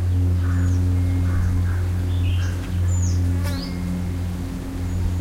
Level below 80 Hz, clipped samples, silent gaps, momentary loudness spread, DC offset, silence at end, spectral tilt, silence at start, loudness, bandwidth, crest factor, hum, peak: -30 dBFS; under 0.1%; none; 7 LU; under 0.1%; 0 s; -6.5 dB/octave; 0 s; -23 LUFS; 13 kHz; 10 dB; none; -10 dBFS